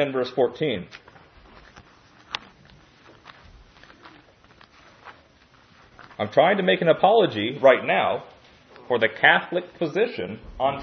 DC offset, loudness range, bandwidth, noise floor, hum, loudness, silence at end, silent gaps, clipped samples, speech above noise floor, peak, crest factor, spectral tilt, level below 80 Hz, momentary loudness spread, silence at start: under 0.1%; 22 LU; 6.6 kHz; -56 dBFS; none; -21 LUFS; 0 s; none; under 0.1%; 34 dB; -2 dBFS; 24 dB; -6.5 dB/octave; -58 dBFS; 17 LU; 0 s